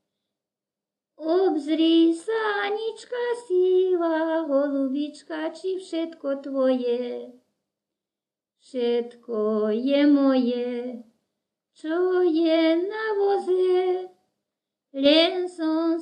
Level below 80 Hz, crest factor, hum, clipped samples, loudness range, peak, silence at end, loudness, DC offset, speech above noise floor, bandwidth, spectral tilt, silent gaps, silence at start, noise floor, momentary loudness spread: -78 dBFS; 20 dB; none; under 0.1%; 6 LU; -6 dBFS; 0 s; -23 LUFS; under 0.1%; over 67 dB; 9.6 kHz; -5 dB/octave; none; 1.2 s; under -90 dBFS; 12 LU